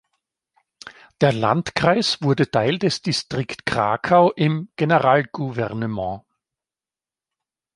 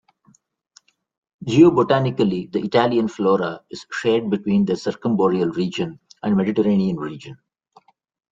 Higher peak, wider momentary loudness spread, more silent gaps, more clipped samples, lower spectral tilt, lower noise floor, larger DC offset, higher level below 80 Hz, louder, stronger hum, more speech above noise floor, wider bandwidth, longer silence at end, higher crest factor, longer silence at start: about the same, -2 dBFS vs -2 dBFS; second, 10 LU vs 15 LU; neither; neither; second, -5.5 dB/octave vs -7 dB/octave; first, under -90 dBFS vs -59 dBFS; neither; about the same, -54 dBFS vs -58 dBFS; about the same, -20 LUFS vs -20 LUFS; neither; first, over 70 dB vs 40 dB; first, 11.5 kHz vs 7.8 kHz; first, 1.55 s vs 0.95 s; about the same, 20 dB vs 18 dB; second, 0.85 s vs 1.4 s